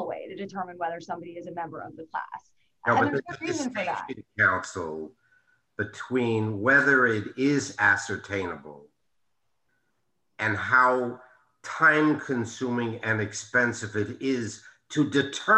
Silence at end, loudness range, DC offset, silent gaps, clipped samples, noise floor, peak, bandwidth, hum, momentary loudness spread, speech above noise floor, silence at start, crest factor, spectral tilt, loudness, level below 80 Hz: 0 s; 6 LU; under 0.1%; none; under 0.1%; -80 dBFS; -8 dBFS; 10.5 kHz; none; 17 LU; 54 dB; 0 s; 20 dB; -5 dB/octave; -26 LUFS; -68 dBFS